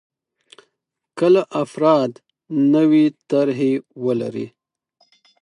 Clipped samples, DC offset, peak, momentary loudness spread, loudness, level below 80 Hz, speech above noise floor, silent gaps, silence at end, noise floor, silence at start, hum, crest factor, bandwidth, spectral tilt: under 0.1%; under 0.1%; -4 dBFS; 12 LU; -18 LUFS; -72 dBFS; 60 dB; none; 0.95 s; -77 dBFS; 1.15 s; none; 16 dB; 10.5 kHz; -7.5 dB/octave